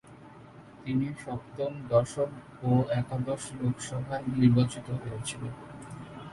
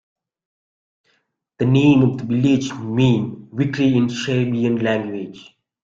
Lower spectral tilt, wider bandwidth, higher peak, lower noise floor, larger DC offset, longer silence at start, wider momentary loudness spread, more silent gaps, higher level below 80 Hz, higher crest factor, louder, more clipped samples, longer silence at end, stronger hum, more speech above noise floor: about the same, -7 dB/octave vs -7 dB/octave; first, 11.5 kHz vs 7.6 kHz; second, -10 dBFS vs -2 dBFS; second, -50 dBFS vs -67 dBFS; neither; second, 0.05 s vs 1.6 s; first, 19 LU vs 10 LU; neither; about the same, -56 dBFS vs -54 dBFS; first, 22 dB vs 16 dB; second, -30 LUFS vs -18 LUFS; neither; second, 0 s vs 0.4 s; neither; second, 21 dB vs 49 dB